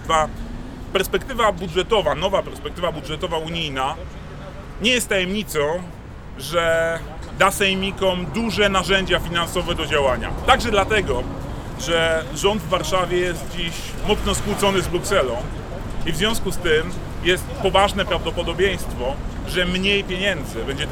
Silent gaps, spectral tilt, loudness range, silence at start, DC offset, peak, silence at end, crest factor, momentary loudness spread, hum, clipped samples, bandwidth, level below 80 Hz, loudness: none; -4 dB/octave; 4 LU; 0 s; under 0.1%; 0 dBFS; 0 s; 20 dB; 12 LU; none; under 0.1%; over 20 kHz; -32 dBFS; -21 LUFS